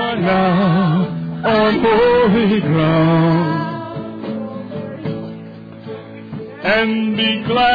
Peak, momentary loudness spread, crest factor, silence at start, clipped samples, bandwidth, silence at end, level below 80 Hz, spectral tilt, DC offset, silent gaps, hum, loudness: -6 dBFS; 18 LU; 10 dB; 0 s; under 0.1%; 5 kHz; 0 s; -46 dBFS; -9 dB/octave; under 0.1%; none; none; -16 LUFS